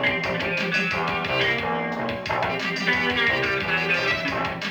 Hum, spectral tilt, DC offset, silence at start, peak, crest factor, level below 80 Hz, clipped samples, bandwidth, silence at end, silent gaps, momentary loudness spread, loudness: none; -4.5 dB/octave; under 0.1%; 0 s; -8 dBFS; 16 dB; -50 dBFS; under 0.1%; over 20 kHz; 0 s; none; 6 LU; -23 LUFS